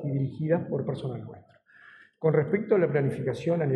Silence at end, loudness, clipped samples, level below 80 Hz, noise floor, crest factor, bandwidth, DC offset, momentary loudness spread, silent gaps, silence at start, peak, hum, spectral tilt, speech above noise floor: 0 s; -27 LUFS; under 0.1%; -68 dBFS; -54 dBFS; 16 dB; 9.8 kHz; under 0.1%; 11 LU; none; 0 s; -10 dBFS; none; -9 dB/octave; 28 dB